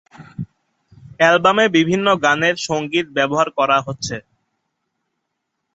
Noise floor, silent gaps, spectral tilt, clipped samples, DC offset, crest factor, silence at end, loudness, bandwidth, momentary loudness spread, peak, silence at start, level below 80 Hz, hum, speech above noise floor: -76 dBFS; none; -4.5 dB/octave; under 0.1%; under 0.1%; 18 dB; 1.55 s; -16 LUFS; 8.2 kHz; 19 LU; -2 dBFS; 0.2 s; -58 dBFS; none; 59 dB